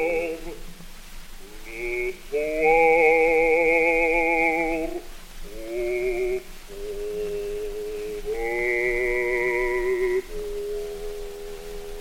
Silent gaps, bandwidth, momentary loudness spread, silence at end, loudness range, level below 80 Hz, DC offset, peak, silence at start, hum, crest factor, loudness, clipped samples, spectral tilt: none; 17 kHz; 23 LU; 0 s; 9 LU; -38 dBFS; under 0.1%; -8 dBFS; 0 s; none; 18 dB; -23 LUFS; under 0.1%; -4.5 dB/octave